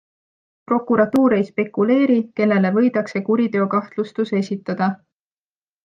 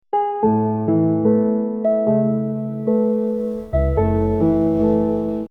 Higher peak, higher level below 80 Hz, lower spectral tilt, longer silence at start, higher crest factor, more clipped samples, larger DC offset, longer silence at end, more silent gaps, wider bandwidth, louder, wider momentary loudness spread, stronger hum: about the same, -4 dBFS vs -6 dBFS; second, -66 dBFS vs -32 dBFS; second, -8 dB/octave vs -11.5 dB/octave; first, 0.7 s vs 0.15 s; about the same, 16 dB vs 12 dB; neither; neither; first, 0.9 s vs 0.05 s; neither; first, 7.6 kHz vs 3.6 kHz; about the same, -19 LUFS vs -19 LUFS; about the same, 7 LU vs 6 LU; neither